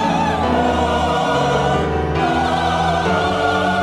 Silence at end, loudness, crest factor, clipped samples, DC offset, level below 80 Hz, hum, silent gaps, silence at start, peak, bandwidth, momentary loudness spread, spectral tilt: 0 s; -17 LUFS; 12 dB; under 0.1%; under 0.1%; -34 dBFS; none; none; 0 s; -4 dBFS; 14 kHz; 1 LU; -5.5 dB/octave